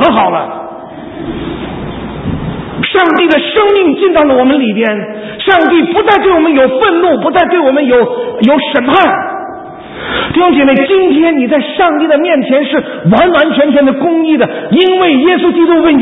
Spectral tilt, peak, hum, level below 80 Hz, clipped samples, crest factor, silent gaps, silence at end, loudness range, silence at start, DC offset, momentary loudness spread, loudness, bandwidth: -8.5 dB/octave; 0 dBFS; none; -38 dBFS; under 0.1%; 8 dB; none; 0 s; 2 LU; 0 s; under 0.1%; 13 LU; -9 LUFS; 4 kHz